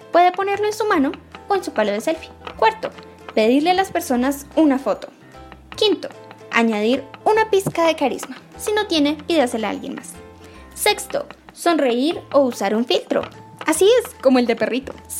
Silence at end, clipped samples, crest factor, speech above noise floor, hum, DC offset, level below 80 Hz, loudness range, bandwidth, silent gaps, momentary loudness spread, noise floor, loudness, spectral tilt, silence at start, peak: 0 s; under 0.1%; 20 dB; 23 dB; none; under 0.1%; -52 dBFS; 3 LU; 16.5 kHz; none; 15 LU; -41 dBFS; -19 LUFS; -3.5 dB/octave; 0.05 s; 0 dBFS